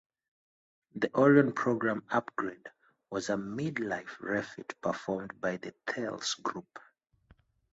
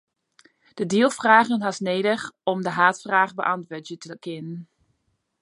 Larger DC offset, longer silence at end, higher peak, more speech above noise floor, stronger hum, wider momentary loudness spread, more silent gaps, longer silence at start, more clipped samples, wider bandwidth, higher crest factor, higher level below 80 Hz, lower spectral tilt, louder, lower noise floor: neither; first, 0.95 s vs 0.8 s; second, -10 dBFS vs -2 dBFS; second, 34 dB vs 50 dB; neither; second, 14 LU vs 19 LU; neither; first, 0.95 s vs 0.75 s; neither; second, 8 kHz vs 11.5 kHz; about the same, 24 dB vs 22 dB; about the same, -72 dBFS vs -72 dBFS; about the same, -5.5 dB/octave vs -4.5 dB/octave; second, -32 LUFS vs -21 LUFS; second, -65 dBFS vs -73 dBFS